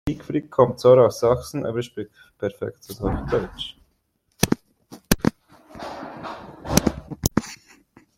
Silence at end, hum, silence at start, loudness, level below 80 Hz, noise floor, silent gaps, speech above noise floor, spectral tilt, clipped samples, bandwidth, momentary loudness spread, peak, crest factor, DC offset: 0.6 s; none; 0.05 s; -22 LUFS; -42 dBFS; -69 dBFS; none; 48 dB; -5 dB/octave; under 0.1%; 16.5 kHz; 20 LU; 0 dBFS; 24 dB; under 0.1%